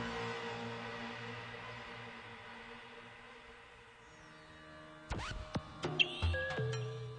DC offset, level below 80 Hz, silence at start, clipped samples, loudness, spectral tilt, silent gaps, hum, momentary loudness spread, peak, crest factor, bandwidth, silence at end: under 0.1%; -54 dBFS; 0 s; under 0.1%; -40 LUFS; -5 dB/octave; none; none; 21 LU; -16 dBFS; 26 dB; 10 kHz; 0 s